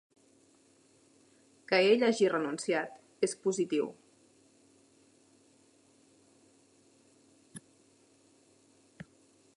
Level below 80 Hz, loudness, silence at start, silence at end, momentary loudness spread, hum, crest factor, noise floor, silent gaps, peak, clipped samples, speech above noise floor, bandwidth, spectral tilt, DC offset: -84 dBFS; -30 LUFS; 1.7 s; 2 s; 28 LU; none; 22 dB; -65 dBFS; none; -14 dBFS; under 0.1%; 36 dB; 11.5 kHz; -4 dB/octave; under 0.1%